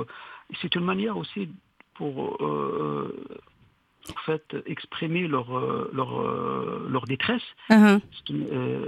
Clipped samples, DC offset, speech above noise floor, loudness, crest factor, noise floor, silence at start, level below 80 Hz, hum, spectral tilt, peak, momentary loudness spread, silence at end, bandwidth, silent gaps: under 0.1%; under 0.1%; 36 dB; -26 LUFS; 24 dB; -62 dBFS; 0 s; -64 dBFS; none; -6.5 dB/octave; -2 dBFS; 16 LU; 0 s; 12 kHz; none